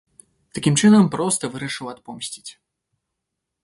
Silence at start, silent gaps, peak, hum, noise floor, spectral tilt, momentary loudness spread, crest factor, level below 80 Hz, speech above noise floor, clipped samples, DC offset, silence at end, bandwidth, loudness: 0.55 s; none; -4 dBFS; none; -81 dBFS; -5 dB/octave; 20 LU; 18 dB; -60 dBFS; 61 dB; under 0.1%; under 0.1%; 1.1 s; 11.5 kHz; -19 LUFS